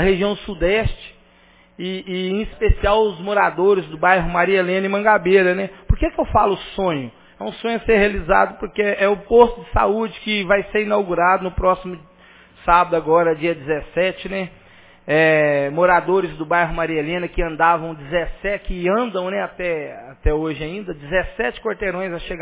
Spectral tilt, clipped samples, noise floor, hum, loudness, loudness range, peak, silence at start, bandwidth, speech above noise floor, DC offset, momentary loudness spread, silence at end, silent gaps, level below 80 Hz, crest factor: -9.5 dB/octave; under 0.1%; -52 dBFS; none; -19 LUFS; 5 LU; 0 dBFS; 0 s; 4 kHz; 33 dB; under 0.1%; 11 LU; 0 s; none; -32 dBFS; 18 dB